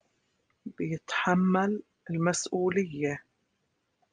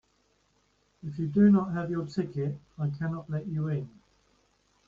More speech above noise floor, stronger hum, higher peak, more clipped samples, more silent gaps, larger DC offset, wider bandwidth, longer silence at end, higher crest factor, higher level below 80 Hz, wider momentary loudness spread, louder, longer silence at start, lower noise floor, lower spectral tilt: first, 49 dB vs 42 dB; neither; about the same, -12 dBFS vs -12 dBFS; neither; neither; neither; first, 10 kHz vs 7.2 kHz; about the same, 0.9 s vs 1 s; about the same, 20 dB vs 18 dB; second, -68 dBFS vs -62 dBFS; about the same, 13 LU vs 13 LU; about the same, -29 LUFS vs -29 LUFS; second, 0.65 s vs 1.05 s; first, -77 dBFS vs -70 dBFS; second, -5.5 dB/octave vs -9.5 dB/octave